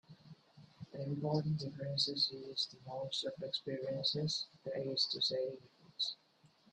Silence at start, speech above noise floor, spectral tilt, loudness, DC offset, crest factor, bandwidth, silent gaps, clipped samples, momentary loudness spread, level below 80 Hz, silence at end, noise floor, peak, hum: 0.1 s; 31 dB; -5 dB/octave; -38 LUFS; under 0.1%; 20 dB; 9.6 kHz; none; under 0.1%; 12 LU; -76 dBFS; 0.6 s; -70 dBFS; -20 dBFS; none